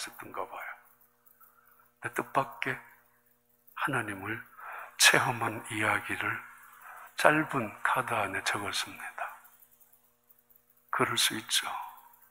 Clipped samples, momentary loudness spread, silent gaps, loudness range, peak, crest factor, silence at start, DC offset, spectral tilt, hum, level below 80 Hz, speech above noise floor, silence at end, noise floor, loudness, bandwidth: under 0.1%; 18 LU; none; 9 LU; -4 dBFS; 28 dB; 0 s; under 0.1%; -2 dB/octave; 60 Hz at -60 dBFS; -74 dBFS; 39 dB; 0.3 s; -69 dBFS; -30 LUFS; 16 kHz